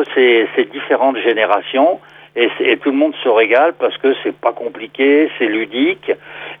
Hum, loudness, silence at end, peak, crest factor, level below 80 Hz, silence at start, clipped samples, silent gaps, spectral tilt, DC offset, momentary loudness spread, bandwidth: none; -15 LUFS; 0.05 s; 0 dBFS; 14 dB; -68 dBFS; 0 s; under 0.1%; none; -6.5 dB/octave; under 0.1%; 10 LU; 4.6 kHz